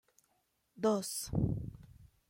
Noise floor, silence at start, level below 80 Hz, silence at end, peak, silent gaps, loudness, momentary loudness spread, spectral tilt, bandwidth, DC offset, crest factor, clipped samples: -78 dBFS; 0.75 s; -54 dBFS; 0.25 s; -20 dBFS; none; -36 LUFS; 8 LU; -6 dB/octave; 16.5 kHz; under 0.1%; 18 dB; under 0.1%